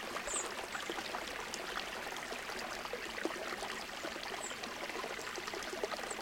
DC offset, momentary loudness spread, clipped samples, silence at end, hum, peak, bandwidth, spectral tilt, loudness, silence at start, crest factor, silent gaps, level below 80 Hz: under 0.1%; 4 LU; under 0.1%; 0 s; none; -20 dBFS; 17 kHz; -1.5 dB/octave; -40 LUFS; 0 s; 22 dB; none; -66 dBFS